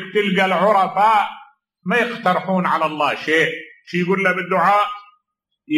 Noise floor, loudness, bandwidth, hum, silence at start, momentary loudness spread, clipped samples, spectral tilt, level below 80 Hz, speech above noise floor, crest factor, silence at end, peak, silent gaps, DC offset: -75 dBFS; -18 LUFS; 13.5 kHz; none; 0 s; 9 LU; under 0.1%; -5.5 dB/octave; -70 dBFS; 57 dB; 16 dB; 0 s; -4 dBFS; none; under 0.1%